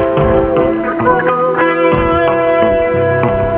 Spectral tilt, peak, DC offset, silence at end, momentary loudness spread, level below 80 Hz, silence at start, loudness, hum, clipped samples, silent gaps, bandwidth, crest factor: -10.5 dB/octave; 0 dBFS; 0.2%; 0 s; 2 LU; -30 dBFS; 0 s; -12 LUFS; none; under 0.1%; none; 4 kHz; 12 dB